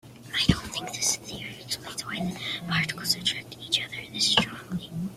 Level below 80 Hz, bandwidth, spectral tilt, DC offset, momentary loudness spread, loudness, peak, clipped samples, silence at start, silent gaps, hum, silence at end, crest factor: -48 dBFS; 16 kHz; -2.5 dB/octave; under 0.1%; 11 LU; -27 LUFS; -4 dBFS; under 0.1%; 0.05 s; none; none; 0 s; 24 dB